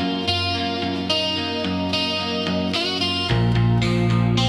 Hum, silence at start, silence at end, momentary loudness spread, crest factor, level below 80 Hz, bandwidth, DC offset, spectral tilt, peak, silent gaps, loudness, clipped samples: none; 0 s; 0 s; 4 LU; 14 dB; -40 dBFS; 11.5 kHz; under 0.1%; -5.5 dB/octave; -6 dBFS; none; -21 LUFS; under 0.1%